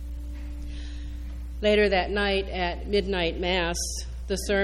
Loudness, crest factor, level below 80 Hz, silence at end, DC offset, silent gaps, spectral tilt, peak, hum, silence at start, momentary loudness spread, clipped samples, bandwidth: -26 LUFS; 18 dB; -34 dBFS; 0 s; under 0.1%; none; -4 dB/octave; -10 dBFS; none; 0 s; 16 LU; under 0.1%; 13.5 kHz